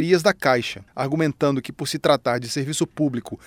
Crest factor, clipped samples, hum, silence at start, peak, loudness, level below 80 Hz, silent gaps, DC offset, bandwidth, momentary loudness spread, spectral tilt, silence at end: 20 dB; under 0.1%; none; 0 s; -2 dBFS; -22 LUFS; -58 dBFS; none; under 0.1%; 17 kHz; 8 LU; -5 dB/octave; 0.1 s